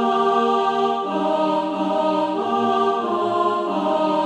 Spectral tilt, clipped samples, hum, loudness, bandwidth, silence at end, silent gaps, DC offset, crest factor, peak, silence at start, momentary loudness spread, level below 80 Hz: -6 dB/octave; under 0.1%; none; -20 LUFS; 10.5 kHz; 0 s; none; under 0.1%; 12 dB; -6 dBFS; 0 s; 3 LU; -64 dBFS